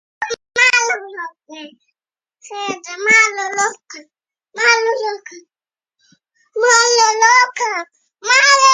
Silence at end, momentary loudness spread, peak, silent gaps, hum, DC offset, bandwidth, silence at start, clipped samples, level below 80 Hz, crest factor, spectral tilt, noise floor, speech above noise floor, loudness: 0 s; 21 LU; 0 dBFS; none; none; under 0.1%; 10.5 kHz; 0.2 s; under 0.1%; -70 dBFS; 16 dB; 1.5 dB/octave; -77 dBFS; 62 dB; -13 LUFS